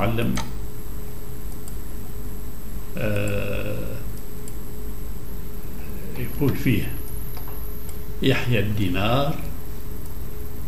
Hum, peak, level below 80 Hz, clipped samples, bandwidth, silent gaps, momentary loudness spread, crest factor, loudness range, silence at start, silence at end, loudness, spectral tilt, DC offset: none; -6 dBFS; -34 dBFS; under 0.1%; 16 kHz; none; 14 LU; 20 dB; 6 LU; 0 s; 0 s; -28 LUFS; -6 dB/octave; 8%